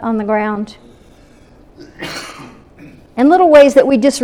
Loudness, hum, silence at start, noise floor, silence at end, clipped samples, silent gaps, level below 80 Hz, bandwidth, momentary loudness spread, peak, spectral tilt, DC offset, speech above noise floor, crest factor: -10 LUFS; none; 0 s; -44 dBFS; 0 s; 0.3%; none; -48 dBFS; 13.5 kHz; 22 LU; 0 dBFS; -5 dB/octave; under 0.1%; 32 dB; 14 dB